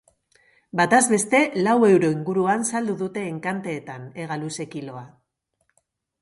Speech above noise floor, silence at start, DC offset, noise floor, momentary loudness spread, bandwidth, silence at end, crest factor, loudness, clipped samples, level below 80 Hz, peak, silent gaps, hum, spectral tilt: 52 dB; 0.75 s; under 0.1%; -74 dBFS; 17 LU; 11.5 kHz; 1.15 s; 18 dB; -21 LUFS; under 0.1%; -68 dBFS; -4 dBFS; none; none; -4.5 dB/octave